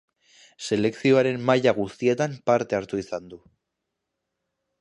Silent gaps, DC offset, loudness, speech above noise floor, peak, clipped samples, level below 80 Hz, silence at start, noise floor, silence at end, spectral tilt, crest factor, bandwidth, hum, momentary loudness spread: none; under 0.1%; -23 LUFS; 59 dB; -6 dBFS; under 0.1%; -62 dBFS; 0.6 s; -82 dBFS; 1.45 s; -6 dB/octave; 20 dB; 11 kHz; none; 11 LU